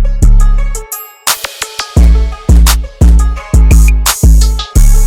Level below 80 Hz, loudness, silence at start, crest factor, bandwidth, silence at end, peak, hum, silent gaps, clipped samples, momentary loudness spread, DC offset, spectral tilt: -8 dBFS; -10 LUFS; 0 s; 6 dB; 17 kHz; 0 s; 0 dBFS; none; none; 0.5%; 10 LU; under 0.1%; -4.5 dB/octave